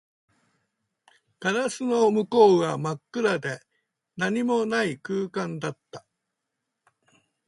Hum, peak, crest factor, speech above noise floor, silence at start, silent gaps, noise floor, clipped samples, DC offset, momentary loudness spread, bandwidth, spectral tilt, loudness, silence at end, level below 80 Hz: none; -6 dBFS; 20 dB; 59 dB; 1.4 s; none; -82 dBFS; under 0.1%; under 0.1%; 18 LU; 11.5 kHz; -5.5 dB/octave; -25 LUFS; 1.5 s; -72 dBFS